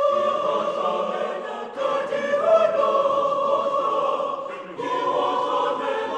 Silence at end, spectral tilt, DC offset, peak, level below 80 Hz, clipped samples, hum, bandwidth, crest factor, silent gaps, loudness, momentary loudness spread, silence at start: 0 s; -4.5 dB/octave; under 0.1%; -8 dBFS; -76 dBFS; under 0.1%; none; 9.2 kHz; 16 dB; none; -23 LUFS; 9 LU; 0 s